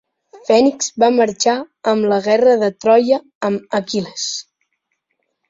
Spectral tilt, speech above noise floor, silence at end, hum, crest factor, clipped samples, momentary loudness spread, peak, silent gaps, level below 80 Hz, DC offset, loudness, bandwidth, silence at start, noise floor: -4 dB/octave; 56 dB; 1.1 s; none; 16 dB; under 0.1%; 10 LU; -2 dBFS; 3.35-3.41 s; -62 dBFS; under 0.1%; -16 LUFS; 7.8 kHz; 0.35 s; -71 dBFS